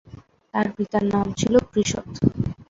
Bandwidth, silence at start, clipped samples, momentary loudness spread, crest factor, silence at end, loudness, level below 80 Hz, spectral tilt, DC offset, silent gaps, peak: 7.8 kHz; 0.55 s; under 0.1%; 6 LU; 20 dB; 0.05 s; -23 LUFS; -44 dBFS; -5.5 dB/octave; under 0.1%; none; -2 dBFS